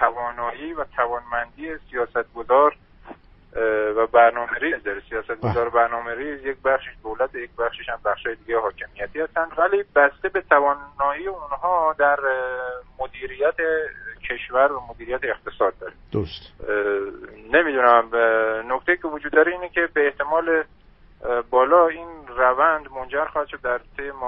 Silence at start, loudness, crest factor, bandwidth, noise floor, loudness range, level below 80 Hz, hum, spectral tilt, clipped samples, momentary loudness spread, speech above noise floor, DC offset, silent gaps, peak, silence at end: 0 s; -22 LUFS; 22 dB; 5.8 kHz; -44 dBFS; 5 LU; -50 dBFS; none; -3 dB/octave; under 0.1%; 13 LU; 23 dB; under 0.1%; none; 0 dBFS; 0 s